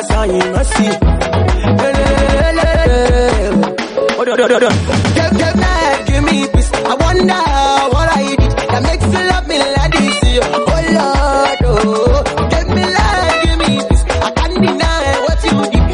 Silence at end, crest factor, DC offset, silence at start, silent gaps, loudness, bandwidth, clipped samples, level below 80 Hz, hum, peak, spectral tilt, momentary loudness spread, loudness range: 0 s; 12 dB; under 0.1%; 0 s; none; -12 LUFS; 11 kHz; under 0.1%; -18 dBFS; none; 0 dBFS; -5.5 dB/octave; 3 LU; 1 LU